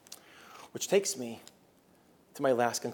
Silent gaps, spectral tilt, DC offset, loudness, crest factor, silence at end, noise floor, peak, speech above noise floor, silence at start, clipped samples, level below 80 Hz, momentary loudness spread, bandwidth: none; -3 dB/octave; under 0.1%; -31 LUFS; 20 dB; 0 s; -64 dBFS; -14 dBFS; 33 dB; 0.1 s; under 0.1%; -84 dBFS; 22 LU; 18 kHz